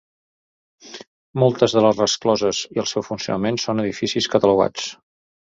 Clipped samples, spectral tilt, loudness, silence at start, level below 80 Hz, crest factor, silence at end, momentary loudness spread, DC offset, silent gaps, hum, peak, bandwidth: under 0.1%; -4.5 dB/octave; -20 LUFS; 0.85 s; -56 dBFS; 20 dB; 0.5 s; 15 LU; under 0.1%; 1.07-1.34 s; none; -2 dBFS; 7.8 kHz